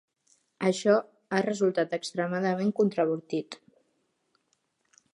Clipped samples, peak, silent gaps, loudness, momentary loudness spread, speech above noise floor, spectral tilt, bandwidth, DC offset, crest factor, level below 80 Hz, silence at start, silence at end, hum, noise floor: under 0.1%; -8 dBFS; none; -28 LUFS; 9 LU; 48 dB; -5.5 dB/octave; 11.5 kHz; under 0.1%; 20 dB; -80 dBFS; 0.6 s; 1.6 s; none; -75 dBFS